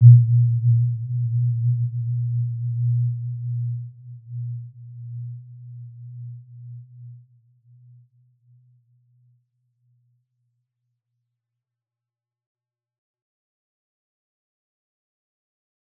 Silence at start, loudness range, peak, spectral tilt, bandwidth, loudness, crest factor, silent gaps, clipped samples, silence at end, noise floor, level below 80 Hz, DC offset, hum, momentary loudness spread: 0 s; 22 LU; -2 dBFS; -19 dB/octave; 0.2 kHz; -22 LUFS; 24 dB; none; under 0.1%; 8.8 s; under -90 dBFS; -70 dBFS; under 0.1%; none; 22 LU